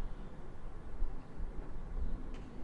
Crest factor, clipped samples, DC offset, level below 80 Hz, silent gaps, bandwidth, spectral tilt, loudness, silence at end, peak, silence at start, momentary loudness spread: 14 dB; under 0.1%; under 0.1%; -40 dBFS; none; 4.4 kHz; -8 dB/octave; -48 LUFS; 0 s; -22 dBFS; 0 s; 7 LU